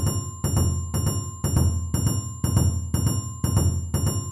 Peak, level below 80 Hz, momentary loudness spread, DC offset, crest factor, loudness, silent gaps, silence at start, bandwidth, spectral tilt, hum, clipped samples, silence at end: -6 dBFS; -32 dBFS; 4 LU; under 0.1%; 18 dB; -25 LUFS; none; 0 s; 14 kHz; -5.5 dB/octave; none; under 0.1%; 0 s